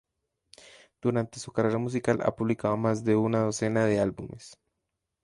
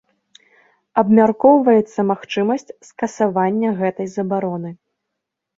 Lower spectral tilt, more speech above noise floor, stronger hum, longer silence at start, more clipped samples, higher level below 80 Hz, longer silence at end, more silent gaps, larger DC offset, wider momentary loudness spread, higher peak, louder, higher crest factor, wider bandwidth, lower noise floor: about the same, -6.5 dB/octave vs -7 dB/octave; second, 56 dB vs 63 dB; neither; about the same, 1.05 s vs 0.95 s; neither; about the same, -60 dBFS vs -64 dBFS; second, 0.7 s vs 0.85 s; neither; neither; second, 7 LU vs 13 LU; second, -10 dBFS vs -2 dBFS; second, -27 LUFS vs -17 LUFS; about the same, 18 dB vs 16 dB; first, 11.5 kHz vs 7.6 kHz; about the same, -83 dBFS vs -80 dBFS